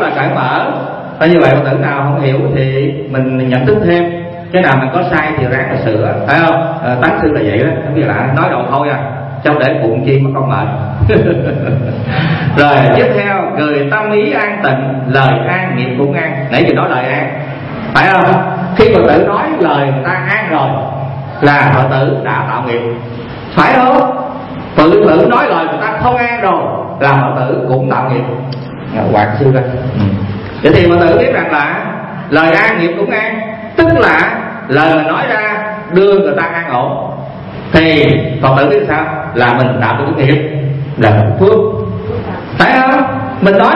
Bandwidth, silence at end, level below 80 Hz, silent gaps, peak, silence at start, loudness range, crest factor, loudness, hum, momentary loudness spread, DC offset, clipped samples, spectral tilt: 5.8 kHz; 0 s; -36 dBFS; none; 0 dBFS; 0 s; 2 LU; 10 dB; -11 LUFS; none; 10 LU; under 0.1%; 0.2%; -8.5 dB/octave